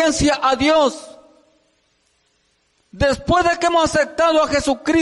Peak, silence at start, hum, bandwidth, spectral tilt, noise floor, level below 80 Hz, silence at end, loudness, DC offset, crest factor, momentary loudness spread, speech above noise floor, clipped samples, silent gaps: -6 dBFS; 0 s; none; 11.5 kHz; -4 dB/octave; -64 dBFS; -38 dBFS; 0 s; -17 LUFS; under 0.1%; 12 dB; 5 LU; 47 dB; under 0.1%; none